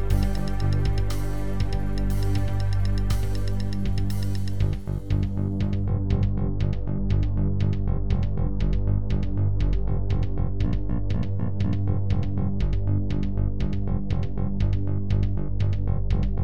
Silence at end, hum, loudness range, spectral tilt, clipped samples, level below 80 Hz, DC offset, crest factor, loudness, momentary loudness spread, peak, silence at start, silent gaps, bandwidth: 0 s; 50 Hz at -35 dBFS; 1 LU; -8 dB/octave; under 0.1%; -28 dBFS; 5%; 14 dB; -27 LUFS; 3 LU; -8 dBFS; 0 s; none; 12 kHz